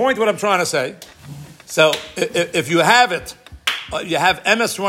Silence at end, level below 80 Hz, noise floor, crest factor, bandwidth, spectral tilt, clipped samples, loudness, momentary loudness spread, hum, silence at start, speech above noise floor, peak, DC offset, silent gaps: 0 s; -52 dBFS; -37 dBFS; 18 dB; 16.5 kHz; -3 dB/octave; under 0.1%; -17 LUFS; 20 LU; none; 0 s; 20 dB; 0 dBFS; under 0.1%; none